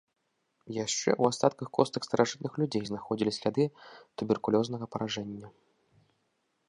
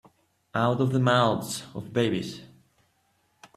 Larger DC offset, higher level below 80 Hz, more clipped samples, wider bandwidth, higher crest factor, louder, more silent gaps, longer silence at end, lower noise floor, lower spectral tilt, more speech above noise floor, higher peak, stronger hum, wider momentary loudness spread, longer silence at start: neither; second, -70 dBFS vs -64 dBFS; neither; second, 11 kHz vs 14 kHz; about the same, 24 dB vs 20 dB; second, -30 LUFS vs -26 LUFS; neither; about the same, 1.2 s vs 1.1 s; first, -77 dBFS vs -69 dBFS; about the same, -5 dB/octave vs -5.5 dB/octave; about the same, 46 dB vs 44 dB; about the same, -8 dBFS vs -8 dBFS; neither; second, 10 LU vs 13 LU; about the same, 0.65 s vs 0.55 s